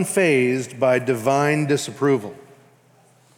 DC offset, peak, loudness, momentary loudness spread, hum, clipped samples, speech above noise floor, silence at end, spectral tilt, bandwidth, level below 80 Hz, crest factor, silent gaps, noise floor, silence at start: under 0.1%; -6 dBFS; -20 LUFS; 5 LU; none; under 0.1%; 36 dB; 1 s; -5.5 dB/octave; 17.5 kHz; -74 dBFS; 14 dB; none; -55 dBFS; 0 s